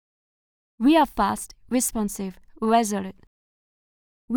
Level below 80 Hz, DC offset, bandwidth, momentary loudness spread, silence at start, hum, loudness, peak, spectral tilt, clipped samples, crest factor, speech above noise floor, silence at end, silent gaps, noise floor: -50 dBFS; under 0.1%; over 20 kHz; 14 LU; 0.8 s; none; -23 LUFS; -8 dBFS; -4 dB/octave; under 0.1%; 18 dB; over 67 dB; 0 s; 3.27-4.28 s; under -90 dBFS